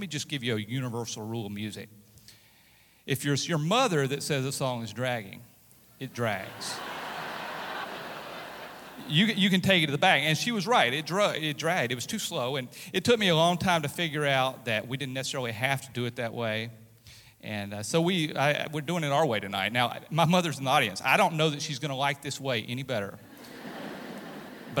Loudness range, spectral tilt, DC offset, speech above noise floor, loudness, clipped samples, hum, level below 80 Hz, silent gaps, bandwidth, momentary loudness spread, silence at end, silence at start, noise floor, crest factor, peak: 9 LU; -4.5 dB/octave; under 0.1%; 32 dB; -28 LUFS; under 0.1%; none; -68 dBFS; none; 19 kHz; 17 LU; 0 s; 0 s; -60 dBFS; 22 dB; -8 dBFS